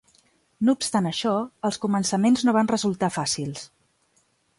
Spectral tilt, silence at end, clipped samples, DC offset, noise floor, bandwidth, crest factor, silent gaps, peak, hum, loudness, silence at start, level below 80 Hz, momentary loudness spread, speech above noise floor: -4.5 dB/octave; 0.95 s; under 0.1%; under 0.1%; -66 dBFS; 11.5 kHz; 16 dB; none; -8 dBFS; none; -24 LUFS; 0.6 s; -64 dBFS; 8 LU; 43 dB